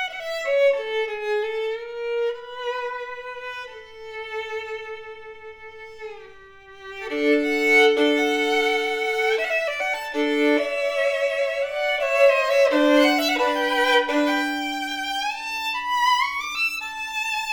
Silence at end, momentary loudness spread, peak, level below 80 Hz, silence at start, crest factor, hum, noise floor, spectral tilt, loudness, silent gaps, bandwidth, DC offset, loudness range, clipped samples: 0 s; 19 LU; -6 dBFS; -60 dBFS; 0 s; 18 dB; none; -45 dBFS; -1.5 dB/octave; -22 LUFS; none; over 20 kHz; under 0.1%; 14 LU; under 0.1%